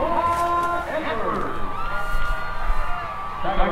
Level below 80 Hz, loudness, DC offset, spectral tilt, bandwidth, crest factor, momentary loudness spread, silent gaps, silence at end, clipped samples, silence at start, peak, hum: -28 dBFS; -25 LUFS; under 0.1%; -5.5 dB/octave; 12 kHz; 16 dB; 8 LU; none; 0 s; under 0.1%; 0 s; -6 dBFS; none